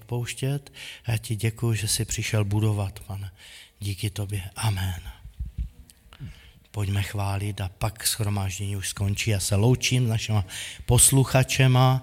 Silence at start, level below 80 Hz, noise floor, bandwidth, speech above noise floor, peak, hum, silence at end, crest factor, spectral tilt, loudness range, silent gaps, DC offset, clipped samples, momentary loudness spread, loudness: 0 s; -44 dBFS; -50 dBFS; 16.5 kHz; 26 dB; -4 dBFS; none; 0 s; 22 dB; -4 dB/octave; 10 LU; none; under 0.1%; under 0.1%; 19 LU; -25 LUFS